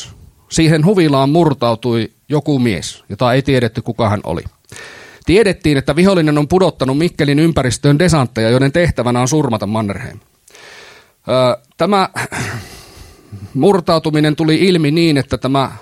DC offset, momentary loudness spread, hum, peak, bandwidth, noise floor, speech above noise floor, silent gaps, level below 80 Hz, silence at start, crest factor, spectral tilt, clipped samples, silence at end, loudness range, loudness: under 0.1%; 13 LU; none; 0 dBFS; 15 kHz; -41 dBFS; 28 dB; none; -38 dBFS; 0 s; 14 dB; -6 dB/octave; under 0.1%; 0 s; 5 LU; -14 LUFS